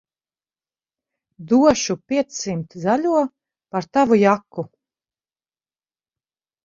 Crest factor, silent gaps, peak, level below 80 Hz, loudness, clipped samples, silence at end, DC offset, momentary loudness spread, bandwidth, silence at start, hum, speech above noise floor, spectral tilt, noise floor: 20 dB; none; -2 dBFS; -58 dBFS; -19 LUFS; under 0.1%; 2 s; under 0.1%; 13 LU; 7.6 kHz; 1.4 s; none; over 71 dB; -5 dB/octave; under -90 dBFS